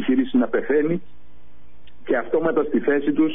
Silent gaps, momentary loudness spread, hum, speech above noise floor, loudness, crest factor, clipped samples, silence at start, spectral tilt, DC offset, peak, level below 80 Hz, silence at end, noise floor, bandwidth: none; 5 LU; none; 32 dB; -21 LUFS; 14 dB; under 0.1%; 0 s; -5.5 dB/octave; 3%; -8 dBFS; -56 dBFS; 0 s; -53 dBFS; 3.8 kHz